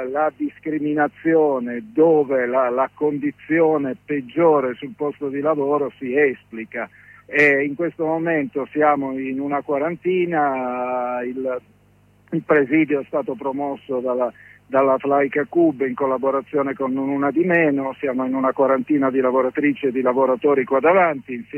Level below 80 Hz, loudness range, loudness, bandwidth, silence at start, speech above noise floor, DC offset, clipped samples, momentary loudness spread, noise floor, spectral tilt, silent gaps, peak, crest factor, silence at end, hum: -66 dBFS; 3 LU; -20 LUFS; 6.2 kHz; 0 s; 35 dB; under 0.1%; under 0.1%; 9 LU; -55 dBFS; -8.5 dB/octave; none; -4 dBFS; 16 dB; 0 s; none